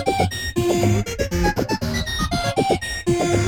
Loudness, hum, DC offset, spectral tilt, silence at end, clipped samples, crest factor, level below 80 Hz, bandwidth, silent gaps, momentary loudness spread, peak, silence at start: -21 LUFS; none; 0.3%; -5 dB/octave; 0 s; under 0.1%; 16 dB; -32 dBFS; 18.5 kHz; none; 4 LU; -6 dBFS; 0 s